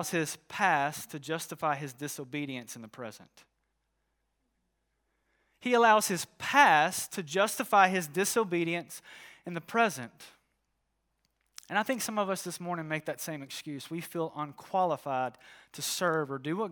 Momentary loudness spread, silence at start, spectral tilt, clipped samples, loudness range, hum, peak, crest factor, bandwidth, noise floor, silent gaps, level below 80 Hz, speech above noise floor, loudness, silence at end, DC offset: 17 LU; 0 s; -3.5 dB/octave; under 0.1%; 12 LU; none; -8 dBFS; 24 dB; over 20 kHz; -79 dBFS; none; -80 dBFS; 49 dB; -30 LUFS; 0 s; under 0.1%